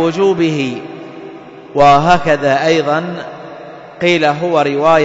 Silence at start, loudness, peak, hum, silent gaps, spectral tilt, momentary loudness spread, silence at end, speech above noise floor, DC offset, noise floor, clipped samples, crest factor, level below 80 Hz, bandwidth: 0 s; -13 LUFS; 0 dBFS; none; none; -5.5 dB/octave; 22 LU; 0 s; 20 dB; under 0.1%; -32 dBFS; under 0.1%; 14 dB; -42 dBFS; 7.8 kHz